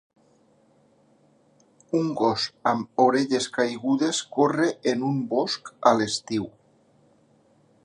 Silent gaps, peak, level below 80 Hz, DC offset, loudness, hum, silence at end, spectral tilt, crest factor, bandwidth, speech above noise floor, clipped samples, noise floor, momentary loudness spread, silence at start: none; -2 dBFS; -68 dBFS; under 0.1%; -24 LUFS; none; 1.35 s; -4.5 dB/octave; 24 dB; 11 kHz; 37 dB; under 0.1%; -61 dBFS; 7 LU; 1.95 s